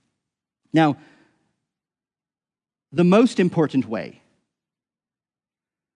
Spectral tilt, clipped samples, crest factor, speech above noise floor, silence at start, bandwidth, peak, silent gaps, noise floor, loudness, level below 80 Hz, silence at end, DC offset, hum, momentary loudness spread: -7.5 dB/octave; under 0.1%; 20 dB; over 71 dB; 0.75 s; 10.5 kHz; -4 dBFS; none; under -90 dBFS; -20 LUFS; -72 dBFS; 1.9 s; under 0.1%; none; 15 LU